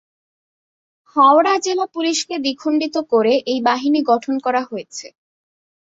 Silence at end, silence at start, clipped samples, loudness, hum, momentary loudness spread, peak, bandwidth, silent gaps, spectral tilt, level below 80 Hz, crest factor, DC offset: 0.9 s; 1.15 s; under 0.1%; -17 LUFS; none; 12 LU; -2 dBFS; 8 kHz; none; -3 dB/octave; -68 dBFS; 18 dB; under 0.1%